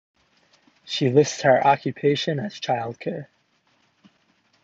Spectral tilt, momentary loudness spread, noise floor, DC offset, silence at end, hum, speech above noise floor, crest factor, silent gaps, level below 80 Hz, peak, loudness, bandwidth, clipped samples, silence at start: -5 dB/octave; 13 LU; -65 dBFS; under 0.1%; 1.4 s; none; 44 dB; 22 dB; none; -70 dBFS; -4 dBFS; -22 LUFS; 7.8 kHz; under 0.1%; 0.85 s